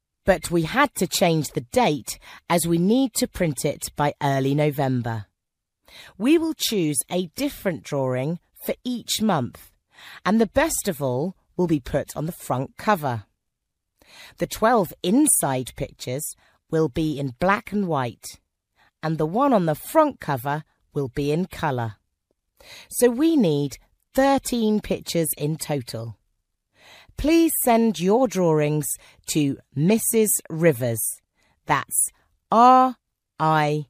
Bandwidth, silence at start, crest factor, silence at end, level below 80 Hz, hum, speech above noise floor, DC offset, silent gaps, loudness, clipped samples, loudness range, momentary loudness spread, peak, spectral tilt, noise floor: 15.5 kHz; 0.25 s; 20 dB; 0.05 s; -50 dBFS; none; 59 dB; under 0.1%; none; -22 LUFS; under 0.1%; 5 LU; 11 LU; -4 dBFS; -5 dB/octave; -81 dBFS